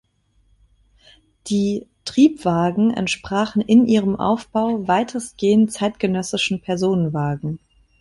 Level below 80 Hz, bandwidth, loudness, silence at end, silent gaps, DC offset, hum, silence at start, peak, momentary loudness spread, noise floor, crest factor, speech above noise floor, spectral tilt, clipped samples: -52 dBFS; 11.5 kHz; -19 LUFS; 0.45 s; none; under 0.1%; none; 1.45 s; -4 dBFS; 9 LU; -61 dBFS; 16 dB; 42 dB; -6 dB/octave; under 0.1%